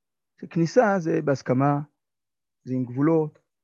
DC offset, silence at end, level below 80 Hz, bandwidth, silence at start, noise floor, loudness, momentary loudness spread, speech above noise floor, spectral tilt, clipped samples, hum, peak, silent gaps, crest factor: under 0.1%; 0.35 s; -72 dBFS; 7.4 kHz; 0.4 s; under -90 dBFS; -24 LUFS; 11 LU; over 67 dB; -8 dB/octave; under 0.1%; none; -8 dBFS; none; 18 dB